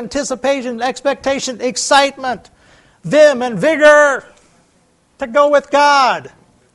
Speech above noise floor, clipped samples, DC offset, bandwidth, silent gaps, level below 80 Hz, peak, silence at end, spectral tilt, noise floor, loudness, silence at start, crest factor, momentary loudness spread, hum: 43 dB; under 0.1%; under 0.1%; 11.5 kHz; none; -52 dBFS; 0 dBFS; 0.45 s; -3 dB/octave; -56 dBFS; -13 LUFS; 0 s; 14 dB; 14 LU; none